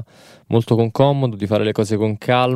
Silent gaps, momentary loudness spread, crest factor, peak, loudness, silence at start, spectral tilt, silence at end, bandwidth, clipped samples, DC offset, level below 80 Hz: none; 5 LU; 16 dB; -2 dBFS; -18 LUFS; 0 s; -7 dB/octave; 0 s; 13.5 kHz; under 0.1%; under 0.1%; -56 dBFS